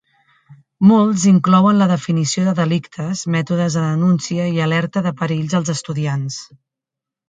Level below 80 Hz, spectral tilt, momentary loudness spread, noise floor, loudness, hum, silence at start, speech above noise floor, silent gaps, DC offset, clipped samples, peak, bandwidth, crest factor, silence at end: -58 dBFS; -6 dB/octave; 10 LU; -85 dBFS; -17 LUFS; none; 0.5 s; 69 dB; none; under 0.1%; under 0.1%; 0 dBFS; 9.2 kHz; 16 dB; 0.85 s